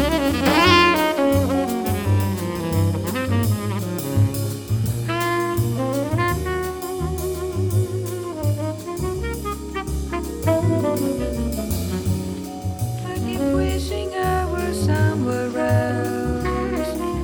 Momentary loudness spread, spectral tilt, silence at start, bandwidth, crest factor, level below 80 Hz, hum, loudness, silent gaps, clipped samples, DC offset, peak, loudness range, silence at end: 8 LU; -6 dB/octave; 0 s; over 20 kHz; 18 dB; -34 dBFS; none; -22 LUFS; none; under 0.1%; under 0.1%; -4 dBFS; 5 LU; 0 s